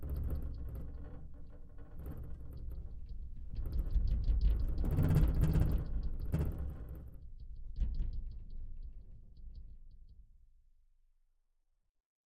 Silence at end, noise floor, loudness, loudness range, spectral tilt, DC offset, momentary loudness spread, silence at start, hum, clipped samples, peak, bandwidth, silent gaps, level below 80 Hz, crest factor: 2.05 s; -77 dBFS; -38 LUFS; 15 LU; -9 dB/octave; under 0.1%; 23 LU; 0 s; none; under 0.1%; -18 dBFS; 15.5 kHz; none; -38 dBFS; 20 dB